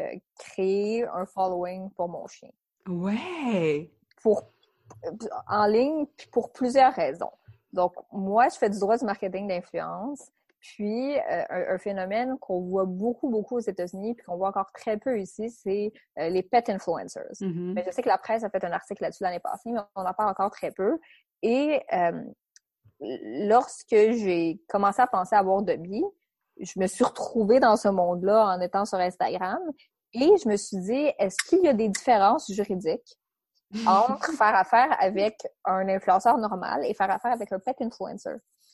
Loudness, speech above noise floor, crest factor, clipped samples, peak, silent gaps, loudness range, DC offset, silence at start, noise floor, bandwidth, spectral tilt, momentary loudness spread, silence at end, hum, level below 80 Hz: -26 LUFS; 52 dB; 18 dB; under 0.1%; -8 dBFS; none; 6 LU; under 0.1%; 0 s; -78 dBFS; 12.5 kHz; -5.5 dB/octave; 13 LU; 0.35 s; none; -66 dBFS